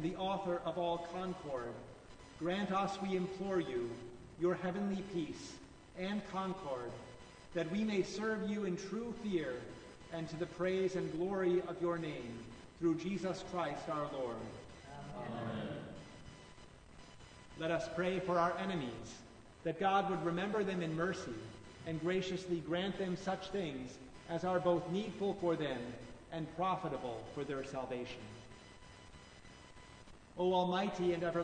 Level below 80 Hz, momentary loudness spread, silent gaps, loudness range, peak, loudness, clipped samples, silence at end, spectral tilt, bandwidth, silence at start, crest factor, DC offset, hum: -64 dBFS; 20 LU; none; 6 LU; -22 dBFS; -39 LUFS; under 0.1%; 0 s; -6 dB/octave; 9.4 kHz; 0 s; 18 dB; under 0.1%; none